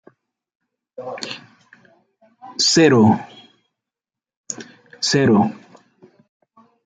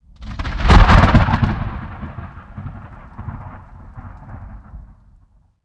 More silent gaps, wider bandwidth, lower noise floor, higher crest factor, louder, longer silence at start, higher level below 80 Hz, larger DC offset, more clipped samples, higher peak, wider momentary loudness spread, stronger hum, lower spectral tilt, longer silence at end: first, 4.37-4.44 s vs none; about the same, 9.4 kHz vs 8.6 kHz; first, -89 dBFS vs -52 dBFS; about the same, 20 dB vs 18 dB; about the same, -16 LUFS vs -15 LUFS; first, 1 s vs 0.2 s; second, -62 dBFS vs -22 dBFS; neither; neither; about the same, -2 dBFS vs 0 dBFS; second, 21 LU vs 27 LU; neither; second, -4.5 dB/octave vs -7 dB/octave; first, 1.3 s vs 0.85 s